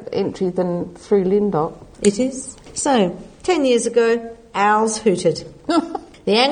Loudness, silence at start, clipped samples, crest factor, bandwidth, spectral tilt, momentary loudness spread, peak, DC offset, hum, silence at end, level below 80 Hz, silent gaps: -19 LUFS; 0 s; under 0.1%; 18 dB; 9.8 kHz; -4.5 dB/octave; 11 LU; -2 dBFS; under 0.1%; none; 0 s; -50 dBFS; none